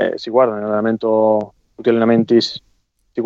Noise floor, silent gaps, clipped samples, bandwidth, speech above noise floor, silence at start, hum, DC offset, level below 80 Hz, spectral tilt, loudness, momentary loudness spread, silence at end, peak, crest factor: -61 dBFS; none; under 0.1%; 7.6 kHz; 45 dB; 0 s; none; under 0.1%; -62 dBFS; -6.5 dB/octave; -16 LUFS; 12 LU; 0 s; -2 dBFS; 14 dB